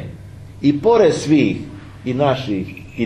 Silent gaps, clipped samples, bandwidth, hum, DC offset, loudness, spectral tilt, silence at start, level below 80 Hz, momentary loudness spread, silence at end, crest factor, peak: none; under 0.1%; 10.5 kHz; none; under 0.1%; -17 LUFS; -6.5 dB/octave; 0 s; -46 dBFS; 21 LU; 0 s; 16 dB; -2 dBFS